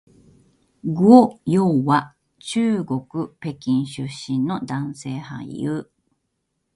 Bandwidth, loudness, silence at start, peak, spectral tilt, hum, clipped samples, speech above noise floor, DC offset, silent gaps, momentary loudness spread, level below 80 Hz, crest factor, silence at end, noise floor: 11.5 kHz; -20 LUFS; 0.85 s; 0 dBFS; -7 dB/octave; none; under 0.1%; 55 dB; under 0.1%; none; 18 LU; -60 dBFS; 20 dB; 0.95 s; -74 dBFS